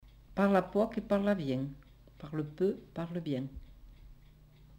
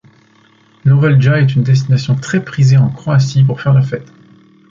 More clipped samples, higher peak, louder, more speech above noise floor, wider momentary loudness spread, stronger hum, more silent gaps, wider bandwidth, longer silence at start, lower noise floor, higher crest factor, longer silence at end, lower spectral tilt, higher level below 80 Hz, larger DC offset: neither; second, -14 dBFS vs -2 dBFS; second, -33 LUFS vs -12 LUFS; second, 26 dB vs 38 dB; first, 14 LU vs 7 LU; neither; neither; first, 16 kHz vs 7.4 kHz; second, 0.05 s vs 0.85 s; first, -58 dBFS vs -49 dBFS; first, 20 dB vs 10 dB; second, 0 s vs 0.65 s; about the same, -8.5 dB/octave vs -7.5 dB/octave; second, -56 dBFS vs -48 dBFS; neither